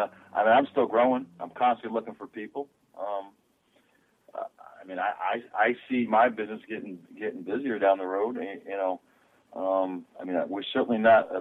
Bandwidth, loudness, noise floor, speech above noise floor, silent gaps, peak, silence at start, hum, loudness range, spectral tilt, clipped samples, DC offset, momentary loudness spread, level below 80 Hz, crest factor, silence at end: 4.1 kHz; -27 LUFS; -67 dBFS; 40 dB; none; -10 dBFS; 0 s; none; 8 LU; -7 dB/octave; under 0.1%; under 0.1%; 17 LU; -76 dBFS; 18 dB; 0 s